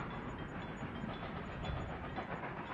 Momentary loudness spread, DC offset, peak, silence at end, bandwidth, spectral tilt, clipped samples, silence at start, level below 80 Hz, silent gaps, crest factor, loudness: 2 LU; under 0.1%; -28 dBFS; 0 s; 10.5 kHz; -7 dB/octave; under 0.1%; 0 s; -54 dBFS; none; 14 dB; -44 LUFS